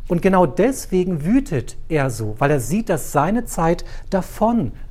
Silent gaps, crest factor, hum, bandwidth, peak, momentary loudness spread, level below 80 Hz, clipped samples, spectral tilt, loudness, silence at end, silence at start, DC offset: none; 16 dB; none; 16 kHz; -2 dBFS; 8 LU; -32 dBFS; under 0.1%; -6.5 dB/octave; -20 LUFS; 0 s; 0 s; under 0.1%